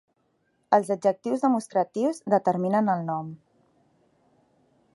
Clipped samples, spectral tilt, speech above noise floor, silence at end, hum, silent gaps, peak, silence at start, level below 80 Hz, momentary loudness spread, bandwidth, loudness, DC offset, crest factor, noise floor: under 0.1%; -7 dB/octave; 46 dB; 1.6 s; none; none; -6 dBFS; 0.7 s; -78 dBFS; 6 LU; 11.5 kHz; -25 LUFS; under 0.1%; 22 dB; -71 dBFS